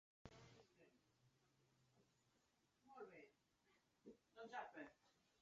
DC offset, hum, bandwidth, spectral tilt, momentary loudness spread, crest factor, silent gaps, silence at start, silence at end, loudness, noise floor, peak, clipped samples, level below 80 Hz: under 0.1%; none; 7.4 kHz; -3.5 dB/octave; 13 LU; 26 dB; none; 0.25 s; 0 s; -61 LUFS; -84 dBFS; -40 dBFS; under 0.1%; -86 dBFS